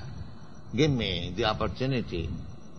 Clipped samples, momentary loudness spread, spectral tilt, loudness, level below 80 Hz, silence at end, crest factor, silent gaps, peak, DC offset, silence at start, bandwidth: under 0.1%; 18 LU; -6 dB/octave; -29 LUFS; -44 dBFS; 0 s; 20 dB; none; -10 dBFS; 0.7%; 0 s; 7 kHz